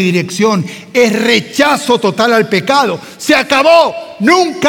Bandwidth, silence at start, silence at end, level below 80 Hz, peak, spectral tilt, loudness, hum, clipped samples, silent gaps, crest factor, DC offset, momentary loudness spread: 18 kHz; 0 s; 0 s; -56 dBFS; 0 dBFS; -4 dB/octave; -11 LUFS; none; under 0.1%; none; 10 dB; under 0.1%; 7 LU